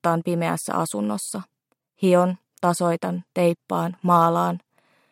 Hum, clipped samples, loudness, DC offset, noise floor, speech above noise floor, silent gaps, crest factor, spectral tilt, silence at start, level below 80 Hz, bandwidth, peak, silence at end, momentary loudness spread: none; under 0.1%; -23 LUFS; under 0.1%; -68 dBFS; 46 dB; none; 18 dB; -6 dB/octave; 0.05 s; -72 dBFS; 16 kHz; -6 dBFS; 0.55 s; 9 LU